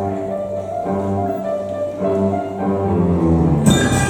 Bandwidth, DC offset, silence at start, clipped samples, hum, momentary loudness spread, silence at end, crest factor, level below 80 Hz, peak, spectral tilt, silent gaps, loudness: 18 kHz; under 0.1%; 0 s; under 0.1%; none; 9 LU; 0 s; 18 dB; -34 dBFS; 0 dBFS; -6 dB/octave; none; -18 LUFS